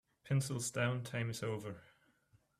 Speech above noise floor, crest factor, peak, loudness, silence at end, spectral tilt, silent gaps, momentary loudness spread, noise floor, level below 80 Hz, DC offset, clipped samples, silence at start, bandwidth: 35 dB; 18 dB; -22 dBFS; -38 LUFS; 0.75 s; -5 dB/octave; none; 10 LU; -73 dBFS; -72 dBFS; under 0.1%; under 0.1%; 0.25 s; 15 kHz